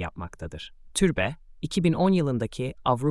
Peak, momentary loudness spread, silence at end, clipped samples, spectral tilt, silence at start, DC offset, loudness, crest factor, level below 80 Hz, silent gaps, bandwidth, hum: -8 dBFS; 15 LU; 0 s; under 0.1%; -6 dB/octave; 0 s; under 0.1%; -26 LUFS; 18 dB; -46 dBFS; none; 12 kHz; none